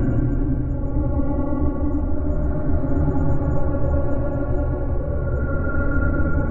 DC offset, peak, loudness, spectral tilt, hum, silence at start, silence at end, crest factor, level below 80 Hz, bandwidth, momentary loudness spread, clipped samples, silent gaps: under 0.1%; -8 dBFS; -23 LUFS; -12.5 dB/octave; none; 0 s; 0 s; 12 dB; -24 dBFS; 2.4 kHz; 3 LU; under 0.1%; none